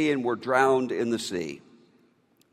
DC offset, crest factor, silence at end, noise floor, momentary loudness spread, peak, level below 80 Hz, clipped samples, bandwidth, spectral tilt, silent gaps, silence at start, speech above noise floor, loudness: under 0.1%; 20 dB; 0.95 s; -64 dBFS; 14 LU; -8 dBFS; -70 dBFS; under 0.1%; 14 kHz; -4.5 dB/octave; none; 0 s; 39 dB; -26 LUFS